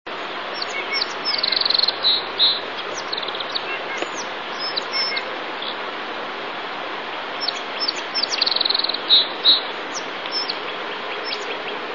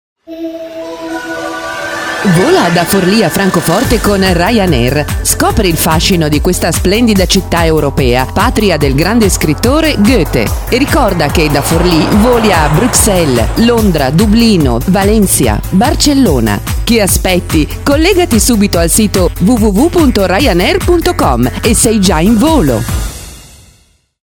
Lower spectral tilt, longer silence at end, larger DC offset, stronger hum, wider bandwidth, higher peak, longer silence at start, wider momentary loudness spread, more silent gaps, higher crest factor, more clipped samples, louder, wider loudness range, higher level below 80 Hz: second, -0.5 dB/octave vs -4.5 dB/octave; second, 0 s vs 0.9 s; first, 0.4% vs 0.1%; neither; second, 7.4 kHz vs over 20 kHz; second, -4 dBFS vs 0 dBFS; second, 0.05 s vs 0.3 s; first, 13 LU vs 7 LU; neither; first, 20 dB vs 10 dB; second, under 0.1% vs 0.3%; second, -21 LUFS vs -9 LUFS; first, 7 LU vs 2 LU; second, -72 dBFS vs -20 dBFS